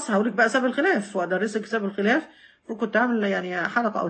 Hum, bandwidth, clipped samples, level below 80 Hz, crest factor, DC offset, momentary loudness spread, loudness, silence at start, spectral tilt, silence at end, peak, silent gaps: none; 8.8 kHz; under 0.1%; -74 dBFS; 16 dB; under 0.1%; 6 LU; -24 LUFS; 0 s; -5 dB/octave; 0 s; -8 dBFS; none